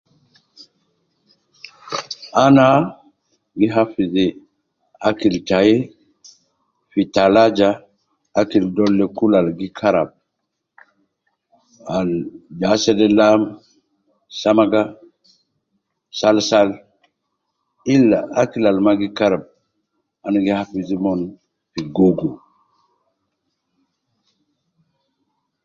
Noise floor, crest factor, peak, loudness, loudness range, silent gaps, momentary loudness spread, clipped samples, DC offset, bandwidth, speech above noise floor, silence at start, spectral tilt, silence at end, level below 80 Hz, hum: -76 dBFS; 18 dB; -2 dBFS; -17 LUFS; 6 LU; none; 15 LU; under 0.1%; under 0.1%; 7.4 kHz; 61 dB; 1.85 s; -6 dB/octave; 3.3 s; -54 dBFS; none